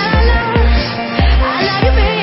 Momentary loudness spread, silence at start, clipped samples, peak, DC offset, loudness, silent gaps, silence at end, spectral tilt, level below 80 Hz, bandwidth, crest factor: 3 LU; 0 s; under 0.1%; 0 dBFS; under 0.1%; -13 LUFS; none; 0 s; -9.5 dB/octave; -14 dBFS; 5.8 kHz; 10 dB